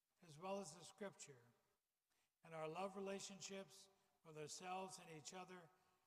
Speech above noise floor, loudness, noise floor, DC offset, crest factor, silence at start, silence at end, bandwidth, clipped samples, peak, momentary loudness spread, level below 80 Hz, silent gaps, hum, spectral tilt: over 35 dB; -54 LUFS; under -90 dBFS; under 0.1%; 18 dB; 0.2 s; 0.3 s; 15.5 kHz; under 0.1%; -38 dBFS; 12 LU; under -90 dBFS; none; none; -3.5 dB/octave